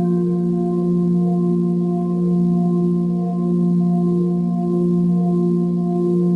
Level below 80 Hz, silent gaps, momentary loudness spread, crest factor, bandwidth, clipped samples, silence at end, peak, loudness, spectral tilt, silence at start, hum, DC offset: -58 dBFS; none; 2 LU; 8 dB; 1.2 kHz; under 0.1%; 0 s; -8 dBFS; -18 LUFS; -11.5 dB/octave; 0 s; none; under 0.1%